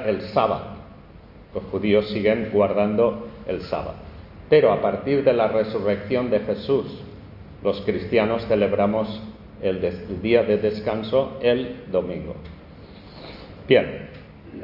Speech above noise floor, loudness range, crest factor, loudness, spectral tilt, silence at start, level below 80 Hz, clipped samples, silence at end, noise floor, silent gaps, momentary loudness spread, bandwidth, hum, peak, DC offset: 24 dB; 3 LU; 20 dB; -22 LUFS; -9 dB/octave; 0 s; -48 dBFS; under 0.1%; 0 s; -45 dBFS; none; 21 LU; 5.8 kHz; none; -2 dBFS; under 0.1%